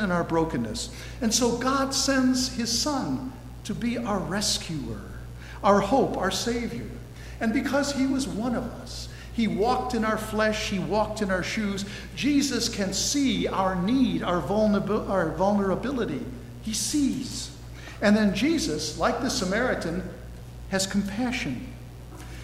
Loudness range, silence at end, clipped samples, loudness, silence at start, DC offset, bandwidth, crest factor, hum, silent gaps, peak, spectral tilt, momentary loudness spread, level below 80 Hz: 3 LU; 0 s; under 0.1%; -26 LUFS; 0 s; under 0.1%; 16 kHz; 20 dB; none; none; -6 dBFS; -4 dB/octave; 14 LU; -44 dBFS